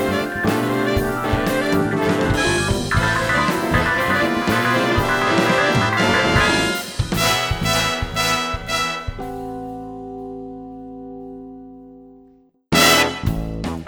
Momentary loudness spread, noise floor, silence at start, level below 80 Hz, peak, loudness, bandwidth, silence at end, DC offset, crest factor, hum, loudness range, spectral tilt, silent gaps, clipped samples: 17 LU; -52 dBFS; 0 s; -34 dBFS; 0 dBFS; -18 LUFS; over 20 kHz; 0 s; under 0.1%; 20 dB; none; 11 LU; -4 dB/octave; none; under 0.1%